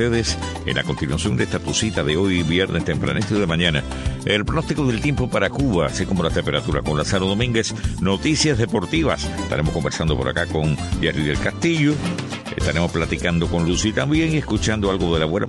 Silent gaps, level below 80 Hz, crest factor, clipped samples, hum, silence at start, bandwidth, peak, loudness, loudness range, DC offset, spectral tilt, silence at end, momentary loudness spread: none; -32 dBFS; 16 dB; under 0.1%; none; 0 s; 11.5 kHz; -4 dBFS; -21 LUFS; 1 LU; under 0.1%; -5 dB/octave; 0 s; 5 LU